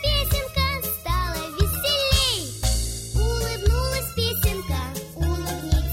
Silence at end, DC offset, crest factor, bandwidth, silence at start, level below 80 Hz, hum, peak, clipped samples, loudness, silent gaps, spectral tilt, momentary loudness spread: 0 s; under 0.1%; 18 dB; 16.5 kHz; 0 s; -26 dBFS; none; -6 dBFS; under 0.1%; -24 LUFS; none; -3.5 dB/octave; 8 LU